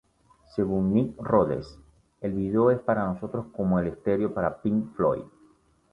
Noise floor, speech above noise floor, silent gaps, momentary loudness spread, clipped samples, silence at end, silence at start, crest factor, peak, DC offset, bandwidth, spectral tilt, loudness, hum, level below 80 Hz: -61 dBFS; 35 dB; none; 11 LU; under 0.1%; 0.65 s; 0.55 s; 20 dB; -8 dBFS; under 0.1%; 5.8 kHz; -10 dB/octave; -27 LUFS; none; -52 dBFS